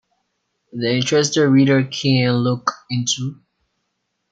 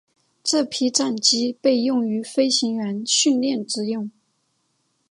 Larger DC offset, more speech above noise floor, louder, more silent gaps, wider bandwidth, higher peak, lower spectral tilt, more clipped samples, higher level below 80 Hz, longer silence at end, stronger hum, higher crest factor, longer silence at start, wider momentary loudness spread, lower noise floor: neither; first, 56 dB vs 48 dB; first, -18 LUFS vs -21 LUFS; neither; second, 9.2 kHz vs 11.5 kHz; about the same, -2 dBFS vs -4 dBFS; first, -5 dB/octave vs -2.5 dB/octave; neither; first, -62 dBFS vs -76 dBFS; about the same, 1 s vs 1 s; neither; about the same, 18 dB vs 18 dB; first, 0.75 s vs 0.45 s; about the same, 9 LU vs 8 LU; first, -73 dBFS vs -69 dBFS